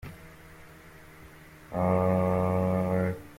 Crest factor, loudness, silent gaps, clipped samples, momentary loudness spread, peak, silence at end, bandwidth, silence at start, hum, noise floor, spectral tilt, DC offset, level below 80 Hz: 16 dB; -27 LUFS; none; under 0.1%; 21 LU; -14 dBFS; 0 s; 16 kHz; 0.05 s; none; -50 dBFS; -9 dB/octave; under 0.1%; -54 dBFS